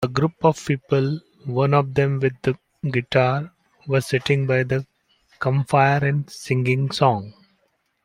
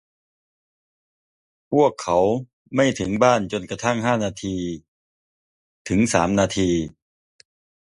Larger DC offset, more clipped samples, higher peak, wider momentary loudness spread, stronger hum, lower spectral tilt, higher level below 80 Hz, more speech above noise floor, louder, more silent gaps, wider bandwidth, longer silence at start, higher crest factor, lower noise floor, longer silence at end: neither; neither; about the same, -2 dBFS vs -2 dBFS; about the same, 9 LU vs 10 LU; neither; first, -7 dB/octave vs -5 dB/octave; second, -56 dBFS vs -48 dBFS; second, 48 dB vs over 70 dB; about the same, -21 LUFS vs -21 LUFS; second, none vs 2.53-2.65 s, 4.88-5.85 s; about the same, 12 kHz vs 11.5 kHz; second, 0 s vs 1.7 s; about the same, 18 dB vs 20 dB; second, -68 dBFS vs under -90 dBFS; second, 0.75 s vs 1 s